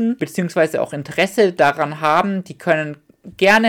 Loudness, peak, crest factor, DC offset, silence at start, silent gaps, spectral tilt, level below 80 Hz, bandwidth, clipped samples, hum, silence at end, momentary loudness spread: -18 LUFS; -4 dBFS; 14 dB; under 0.1%; 0 s; none; -5 dB/octave; -58 dBFS; 17.5 kHz; under 0.1%; none; 0 s; 8 LU